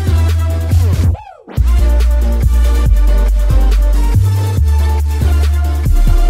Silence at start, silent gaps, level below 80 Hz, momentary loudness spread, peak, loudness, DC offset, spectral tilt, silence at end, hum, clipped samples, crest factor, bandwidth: 0 s; none; -12 dBFS; 2 LU; 0 dBFS; -13 LUFS; under 0.1%; -6.5 dB/octave; 0 s; none; under 0.1%; 10 dB; 15.5 kHz